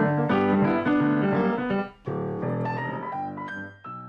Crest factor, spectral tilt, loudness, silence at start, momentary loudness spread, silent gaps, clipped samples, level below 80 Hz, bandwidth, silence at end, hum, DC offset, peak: 14 dB; -9.5 dB/octave; -26 LUFS; 0 s; 12 LU; none; under 0.1%; -58 dBFS; 5.8 kHz; 0 s; none; under 0.1%; -10 dBFS